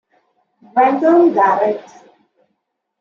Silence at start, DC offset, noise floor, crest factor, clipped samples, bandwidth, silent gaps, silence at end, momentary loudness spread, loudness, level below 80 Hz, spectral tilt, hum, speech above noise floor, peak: 0.75 s; under 0.1%; -72 dBFS; 14 dB; under 0.1%; 6.8 kHz; none; 1.2 s; 9 LU; -14 LUFS; -74 dBFS; -7 dB/octave; none; 59 dB; -2 dBFS